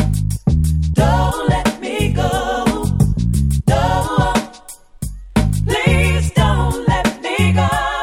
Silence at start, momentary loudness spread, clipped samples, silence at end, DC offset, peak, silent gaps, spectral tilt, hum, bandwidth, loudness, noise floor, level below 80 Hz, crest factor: 0 s; 5 LU; under 0.1%; 0 s; under 0.1%; -2 dBFS; none; -6 dB/octave; none; 16 kHz; -16 LUFS; -38 dBFS; -24 dBFS; 14 dB